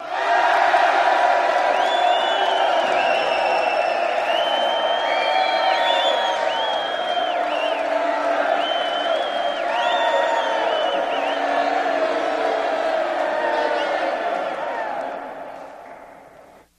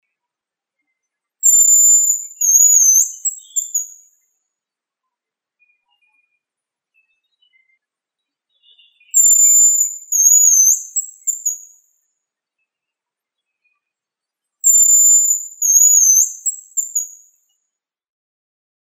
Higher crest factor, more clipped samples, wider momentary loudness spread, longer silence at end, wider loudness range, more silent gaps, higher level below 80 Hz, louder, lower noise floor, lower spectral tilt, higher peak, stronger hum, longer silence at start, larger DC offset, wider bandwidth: about the same, 16 dB vs 18 dB; neither; second, 7 LU vs 15 LU; second, 0.35 s vs 1.75 s; second, 5 LU vs 15 LU; neither; first, -64 dBFS vs under -90 dBFS; second, -20 LUFS vs -10 LUFS; second, -47 dBFS vs -86 dBFS; first, -1.5 dB/octave vs 8 dB/octave; second, -4 dBFS vs 0 dBFS; neither; second, 0 s vs 1.45 s; neither; second, 11.5 kHz vs 16 kHz